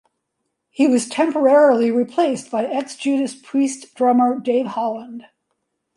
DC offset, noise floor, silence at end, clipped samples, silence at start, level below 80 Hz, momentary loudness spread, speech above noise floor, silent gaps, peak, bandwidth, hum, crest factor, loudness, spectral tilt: under 0.1%; -75 dBFS; 0.75 s; under 0.1%; 0.8 s; -72 dBFS; 11 LU; 58 dB; none; -4 dBFS; 11.5 kHz; none; 16 dB; -18 LUFS; -4.5 dB/octave